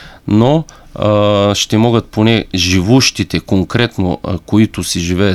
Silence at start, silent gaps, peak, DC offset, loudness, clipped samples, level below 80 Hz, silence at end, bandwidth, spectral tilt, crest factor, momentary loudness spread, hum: 0 s; none; 0 dBFS; under 0.1%; -13 LUFS; under 0.1%; -36 dBFS; 0 s; 14 kHz; -5 dB/octave; 12 dB; 7 LU; none